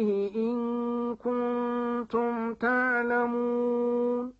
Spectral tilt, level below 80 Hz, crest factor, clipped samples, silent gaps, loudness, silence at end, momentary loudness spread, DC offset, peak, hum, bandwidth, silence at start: -8 dB/octave; -66 dBFS; 14 dB; under 0.1%; none; -28 LUFS; 0.1 s; 5 LU; under 0.1%; -14 dBFS; none; 5.4 kHz; 0 s